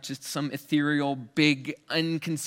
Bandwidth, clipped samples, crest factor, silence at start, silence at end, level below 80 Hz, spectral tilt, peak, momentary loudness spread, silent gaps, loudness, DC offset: 17 kHz; under 0.1%; 20 dB; 0.05 s; 0 s; -74 dBFS; -4.5 dB/octave; -8 dBFS; 8 LU; none; -27 LUFS; under 0.1%